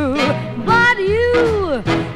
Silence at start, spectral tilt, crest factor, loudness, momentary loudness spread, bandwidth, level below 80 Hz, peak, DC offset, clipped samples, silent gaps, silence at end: 0 s; -6 dB/octave; 14 dB; -15 LUFS; 6 LU; 12.5 kHz; -36 dBFS; -2 dBFS; under 0.1%; under 0.1%; none; 0 s